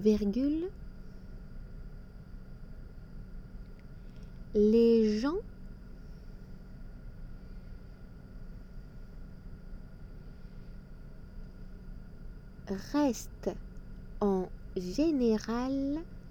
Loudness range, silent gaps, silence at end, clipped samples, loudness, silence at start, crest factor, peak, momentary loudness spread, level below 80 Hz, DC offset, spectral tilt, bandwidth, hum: 20 LU; none; 0 s; under 0.1%; -31 LUFS; 0 s; 20 dB; -14 dBFS; 23 LU; -46 dBFS; under 0.1%; -7 dB/octave; 17 kHz; none